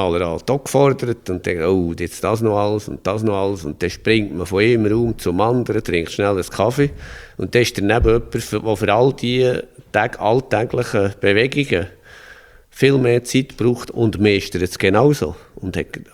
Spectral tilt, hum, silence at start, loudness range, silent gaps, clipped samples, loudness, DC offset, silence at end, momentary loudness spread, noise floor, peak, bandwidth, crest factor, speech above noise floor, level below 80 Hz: -6 dB/octave; none; 0 s; 2 LU; none; under 0.1%; -18 LUFS; under 0.1%; 0.1 s; 8 LU; -44 dBFS; -2 dBFS; 16.5 kHz; 16 dB; 26 dB; -38 dBFS